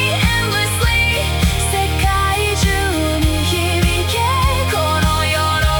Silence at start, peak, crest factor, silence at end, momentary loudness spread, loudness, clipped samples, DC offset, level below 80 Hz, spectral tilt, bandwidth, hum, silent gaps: 0 s; -2 dBFS; 12 dB; 0 s; 2 LU; -16 LUFS; under 0.1%; under 0.1%; -24 dBFS; -4 dB/octave; 19 kHz; none; none